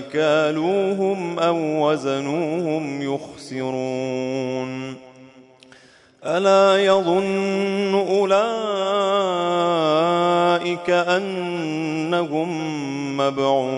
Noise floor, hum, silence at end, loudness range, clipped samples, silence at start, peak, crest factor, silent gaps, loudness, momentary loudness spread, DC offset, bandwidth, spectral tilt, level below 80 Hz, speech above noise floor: -50 dBFS; none; 0 s; 7 LU; under 0.1%; 0 s; -6 dBFS; 16 dB; none; -21 LUFS; 9 LU; under 0.1%; 10.5 kHz; -5.5 dB/octave; -70 dBFS; 30 dB